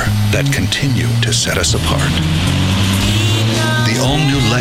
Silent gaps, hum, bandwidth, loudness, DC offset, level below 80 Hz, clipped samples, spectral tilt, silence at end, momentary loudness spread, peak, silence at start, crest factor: none; none; 16 kHz; -14 LUFS; under 0.1%; -28 dBFS; under 0.1%; -4.5 dB/octave; 0 s; 2 LU; -2 dBFS; 0 s; 12 dB